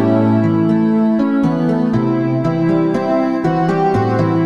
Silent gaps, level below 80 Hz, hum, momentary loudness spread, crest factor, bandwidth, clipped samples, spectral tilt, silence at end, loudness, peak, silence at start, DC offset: none; -48 dBFS; none; 2 LU; 12 dB; 7.4 kHz; under 0.1%; -9.5 dB/octave; 0 s; -15 LUFS; -2 dBFS; 0 s; 0.4%